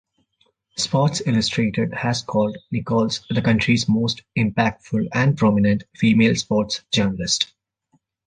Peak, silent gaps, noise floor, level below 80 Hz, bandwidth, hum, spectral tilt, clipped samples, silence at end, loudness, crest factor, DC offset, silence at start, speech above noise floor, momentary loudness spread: -4 dBFS; none; -66 dBFS; -50 dBFS; 9.6 kHz; none; -5 dB/octave; under 0.1%; 0.8 s; -20 LUFS; 18 dB; under 0.1%; 0.75 s; 46 dB; 6 LU